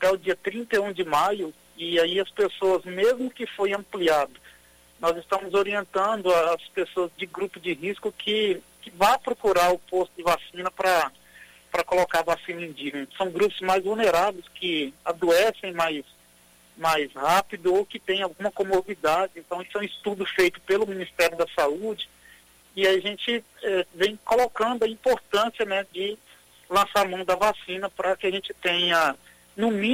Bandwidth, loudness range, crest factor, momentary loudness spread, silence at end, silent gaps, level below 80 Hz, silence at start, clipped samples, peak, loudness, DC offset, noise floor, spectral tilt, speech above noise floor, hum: 16 kHz; 2 LU; 18 dB; 10 LU; 0 s; none; -58 dBFS; 0 s; under 0.1%; -8 dBFS; -25 LUFS; under 0.1%; -57 dBFS; -3.5 dB/octave; 32 dB; none